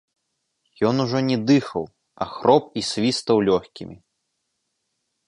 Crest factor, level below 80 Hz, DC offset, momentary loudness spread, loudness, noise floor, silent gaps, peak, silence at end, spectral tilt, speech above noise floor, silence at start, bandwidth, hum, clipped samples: 20 dB; -58 dBFS; under 0.1%; 17 LU; -21 LUFS; -76 dBFS; none; -2 dBFS; 1.35 s; -5.5 dB/octave; 55 dB; 0.8 s; 11 kHz; none; under 0.1%